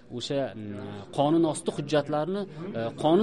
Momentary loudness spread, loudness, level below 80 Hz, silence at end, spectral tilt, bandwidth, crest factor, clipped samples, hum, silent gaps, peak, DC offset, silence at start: 12 LU; -28 LUFS; -64 dBFS; 0 s; -6 dB/octave; 11.5 kHz; 16 dB; under 0.1%; none; none; -12 dBFS; 0.2%; 0.1 s